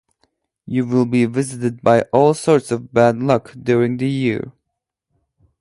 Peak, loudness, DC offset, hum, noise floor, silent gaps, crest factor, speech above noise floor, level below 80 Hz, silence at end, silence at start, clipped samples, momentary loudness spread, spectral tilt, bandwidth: 0 dBFS; -17 LUFS; under 0.1%; none; -79 dBFS; none; 18 dB; 62 dB; -56 dBFS; 1.1 s; 0.7 s; under 0.1%; 8 LU; -7 dB/octave; 11.5 kHz